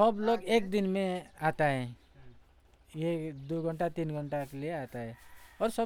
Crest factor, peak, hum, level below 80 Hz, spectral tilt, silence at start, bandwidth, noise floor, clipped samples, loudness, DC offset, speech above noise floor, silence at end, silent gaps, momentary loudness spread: 20 dB; -12 dBFS; none; -60 dBFS; -6.5 dB/octave; 0 s; 17.5 kHz; -62 dBFS; under 0.1%; -33 LUFS; under 0.1%; 30 dB; 0 s; none; 13 LU